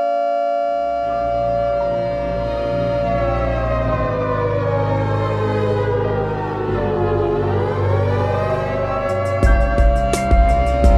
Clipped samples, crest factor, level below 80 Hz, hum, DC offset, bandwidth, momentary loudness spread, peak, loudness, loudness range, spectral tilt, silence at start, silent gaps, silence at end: under 0.1%; 16 dB; -22 dBFS; none; under 0.1%; 11.5 kHz; 5 LU; -2 dBFS; -19 LUFS; 2 LU; -7.5 dB/octave; 0 s; none; 0 s